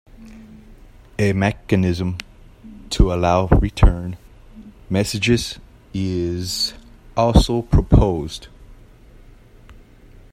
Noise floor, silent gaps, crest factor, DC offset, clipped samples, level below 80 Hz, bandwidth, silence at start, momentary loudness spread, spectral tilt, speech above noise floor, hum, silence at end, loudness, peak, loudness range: -45 dBFS; none; 20 dB; under 0.1%; under 0.1%; -26 dBFS; 15.5 kHz; 0.2 s; 16 LU; -6 dB/octave; 28 dB; none; 0.6 s; -19 LUFS; 0 dBFS; 3 LU